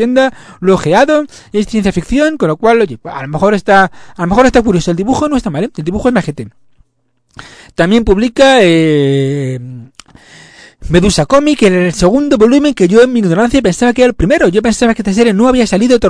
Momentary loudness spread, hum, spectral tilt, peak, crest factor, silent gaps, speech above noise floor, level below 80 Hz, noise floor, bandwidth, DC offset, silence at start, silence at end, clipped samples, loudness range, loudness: 9 LU; none; -5.5 dB/octave; 0 dBFS; 10 dB; none; 50 dB; -30 dBFS; -60 dBFS; 11 kHz; under 0.1%; 0 s; 0 s; 0.9%; 4 LU; -10 LUFS